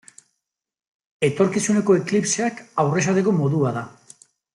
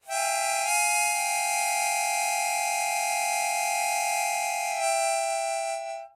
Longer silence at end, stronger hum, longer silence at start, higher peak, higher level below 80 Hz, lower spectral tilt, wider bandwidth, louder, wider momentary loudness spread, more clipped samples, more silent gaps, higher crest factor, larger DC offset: first, 0.65 s vs 0.1 s; neither; first, 1.2 s vs 0.05 s; first, -6 dBFS vs -14 dBFS; first, -64 dBFS vs -86 dBFS; first, -5.5 dB/octave vs 3.5 dB/octave; second, 12 kHz vs 16 kHz; first, -21 LUFS vs -25 LUFS; about the same, 6 LU vs 4 LU; neither; neither; about the same, 16 dB vs 14 dB; neither